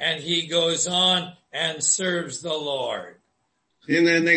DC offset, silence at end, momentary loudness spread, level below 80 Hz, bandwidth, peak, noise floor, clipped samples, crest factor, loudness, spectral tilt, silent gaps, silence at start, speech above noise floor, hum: under 0.1%; 0 s; 10 LU; -70 dBFS; 8.8 kHz; -6 dBFS; -73 dBFS; under 0.1%; 18 dB; -22 LUFS; -2 dB/octave; none; 0 s; 50 dB; none